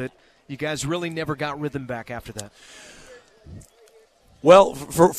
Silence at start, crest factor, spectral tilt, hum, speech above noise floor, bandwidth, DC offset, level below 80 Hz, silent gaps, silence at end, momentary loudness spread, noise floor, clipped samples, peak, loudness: 0 s; 22 dB; -5 dB/octave; none; 34 dB; 14 kHz; under 0.1%; -52 dBFS; none; 0 s; 25 LU; -55 dBFS; under 0.1%; 0 dBFS; -21 LUFS